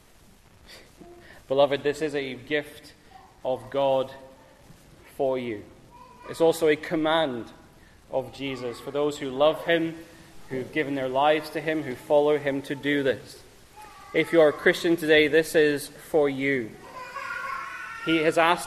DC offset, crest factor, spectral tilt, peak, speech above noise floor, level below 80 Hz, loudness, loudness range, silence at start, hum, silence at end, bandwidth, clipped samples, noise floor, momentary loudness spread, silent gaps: under 0.1%; 20 dB; -5 dB/octave; -6 dBFS; 30 dB; -60 dBFS; -25 LUFS; 7 LU; 0.7 s; none; 0 s; 14 kHz; under 0.1%; -54 dBFS; 15 LU; none